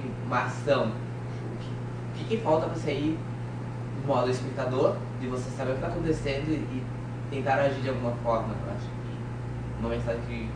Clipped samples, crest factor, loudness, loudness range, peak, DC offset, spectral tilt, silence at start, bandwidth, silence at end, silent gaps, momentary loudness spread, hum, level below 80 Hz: under 0.1%; 18 dB; -30 LUFS; 2 LU; -10 dBFS; under 0.1%; -7 dB/octave; 0 s; 10 kHz; 0 s; none; 9 LU; 60 Hz at -35 dBFS; -46 dBFS